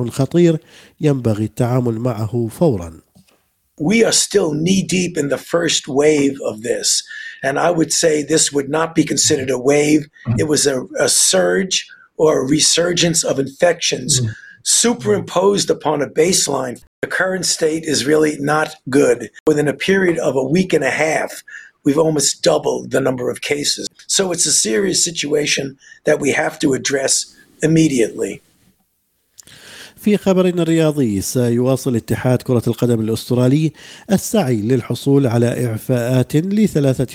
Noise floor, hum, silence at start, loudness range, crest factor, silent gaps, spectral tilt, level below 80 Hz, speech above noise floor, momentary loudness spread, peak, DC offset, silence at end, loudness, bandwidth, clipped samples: -65 dBFS; none; 0 s; 3 LU; 16 dB; 16.87-17.02 s, 19.40-19.46 s; -4 dB/octave; -52 dBFS; 49 dB; 8 LU; -2 dBFS; under 0.1%; 0 s; -16 LUFS; 16.5 kHz; under 0.1%